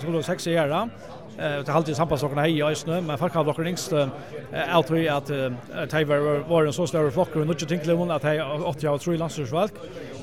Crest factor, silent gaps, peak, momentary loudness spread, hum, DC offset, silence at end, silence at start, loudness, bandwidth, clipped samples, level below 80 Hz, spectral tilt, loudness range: 20 dB; none; -6 dBFS; 7 LU; none; 0.3%; 0 s; 0 s; -25 LUFS; 16 kHz; under 0.1%; -56 dBFS; -6 dB/octave; 2 LU